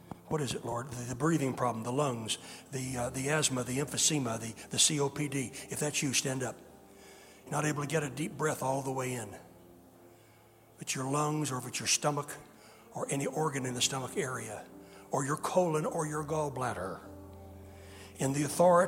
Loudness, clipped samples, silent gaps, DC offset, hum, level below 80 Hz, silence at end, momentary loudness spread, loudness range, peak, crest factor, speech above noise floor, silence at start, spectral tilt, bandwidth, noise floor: -32 LUFS; under 0.1%; none; under 0.1%; none; -64 dBFS; 0 s; 19 LU; 5 LU; -12 dBFS; 22 dB; 27 dB; 0.05 s; -3.5 dB/octave; 16.5 kHz; -60 dBFS